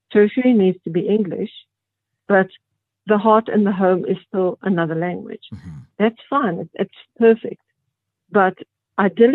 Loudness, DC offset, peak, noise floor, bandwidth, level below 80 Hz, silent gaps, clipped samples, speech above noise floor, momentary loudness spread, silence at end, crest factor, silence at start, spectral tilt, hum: -19 LUFS; under 0.1%; -2 dBFS; -80 dBFS; 4.1 kHz; -62 dBFS; none; under 0.1%; 62 dB; 15 LU; 0 s; 18 dB; 0.1 s; -10 dB/octave; none